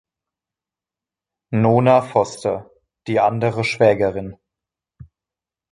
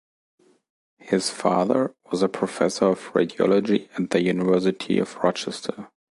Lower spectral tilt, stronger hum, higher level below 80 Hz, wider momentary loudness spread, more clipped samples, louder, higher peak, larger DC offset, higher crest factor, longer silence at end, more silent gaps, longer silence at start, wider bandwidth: first, -7 dB/octave vs -5.5 dB/octave; neither; first, -54 dBFS vs -64 dBFS; first, 15 LU vs 7 LU; neither; first, -18 LUFS vs -23 LUFS; about the same, -2 dBFS vs -4 dBFS; neither; about the same, 20 dB vs 20 dB; first, 1.4 s vs 0.3 s; neither; first, 1.5 s vs 1.05 s; about the same, 11.5 kHz vs 11.5 kHz